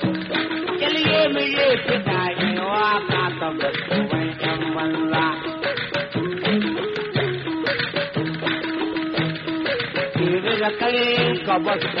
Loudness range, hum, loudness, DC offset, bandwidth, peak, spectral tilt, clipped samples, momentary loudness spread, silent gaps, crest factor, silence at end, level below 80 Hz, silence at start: 4 LU; none; -22 LUFS; under 0.1%; 6 kHz; -6 dBFS; -3 dB/octave; under 0.1%; 6 LU; none; 16 dB; 0 s; -56 dBFS; 0 s